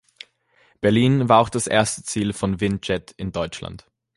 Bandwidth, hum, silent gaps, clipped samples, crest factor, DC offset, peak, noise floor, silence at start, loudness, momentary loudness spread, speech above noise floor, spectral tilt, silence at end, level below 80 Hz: 11.5 kHz; none; none; under 0.1%; 20 dB; under 0.1%; -2 dBFS; -60 dBFS; 0.8 s; -21 LUFS; 13 LU; 40 dB; -5 dB/octave; 0.4 s; -46 dBFS